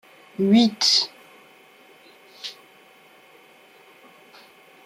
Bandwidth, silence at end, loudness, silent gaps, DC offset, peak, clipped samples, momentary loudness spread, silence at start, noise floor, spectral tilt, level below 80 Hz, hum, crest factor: 15 kHz; 2.35 s; -19 LUFS; none; under 0.1%; -6 dBFS; under 0.1%; 20 LU; 0.4 s; -52 dBFS; -4 dB/octave; -72 dBFS; none; 22 dB